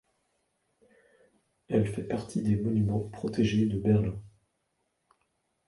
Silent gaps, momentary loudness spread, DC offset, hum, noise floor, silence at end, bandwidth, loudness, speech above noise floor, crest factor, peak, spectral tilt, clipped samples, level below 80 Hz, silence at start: none; 8 LU; under 0.1%; none; -78 dBFS; 1.4 s; 11.5 kHz; -29 LUFS; 50 dB; 18 dB; -14 dBFS; -8 dB/octave; under 0.1%; -52 dBFS; 1.7 s